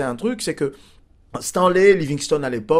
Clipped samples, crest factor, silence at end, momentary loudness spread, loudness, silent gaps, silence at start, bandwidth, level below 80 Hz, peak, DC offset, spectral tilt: under 0.1%; 18 dB; 0 s; 12 LU; -19 LUFS; none; 0 s; 15.5 kHz; -50 dBFS; -2 dBFS; under 0.1%; -5 dB/octave